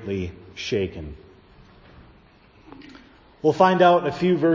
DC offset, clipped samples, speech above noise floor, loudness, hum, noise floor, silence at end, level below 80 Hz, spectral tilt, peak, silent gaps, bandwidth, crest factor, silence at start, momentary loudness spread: under 0.1%; under 0.1%; 33 dB; -21 LUFS; none; -53 dBFS; 0 s; -48 dBFS; -6.5 dB/octave; -2 dBFS; none; 7.6 kHz; 22 dB; 0 s; 18 LU